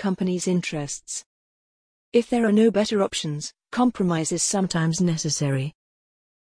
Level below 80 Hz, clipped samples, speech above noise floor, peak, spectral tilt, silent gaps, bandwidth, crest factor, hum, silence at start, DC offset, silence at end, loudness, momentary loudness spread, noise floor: -58 dBFS; under 0.1%; over 67 dB; -8 dBFS; -5 dB/octave; 1.26-2.12 s; 10.5 kHz; 16 dB; none; 0 s; under 0.1%; 0.7 s; -23 LUFS; 11 LU; under -90 dBFS